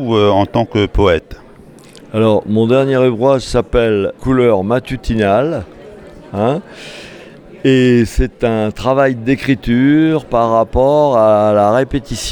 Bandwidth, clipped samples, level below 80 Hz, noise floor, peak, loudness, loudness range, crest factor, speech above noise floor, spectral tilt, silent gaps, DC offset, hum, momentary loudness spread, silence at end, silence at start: 19 kHz; under 0.1%; -30 dBFS; -39 dBFS; 0 dBFS; -13 LUFS; 4 LU; 12 dB; 26 dB; -6.5 dB/octave; none; under 0.1%; none; 9 LU; 0 s; 0 s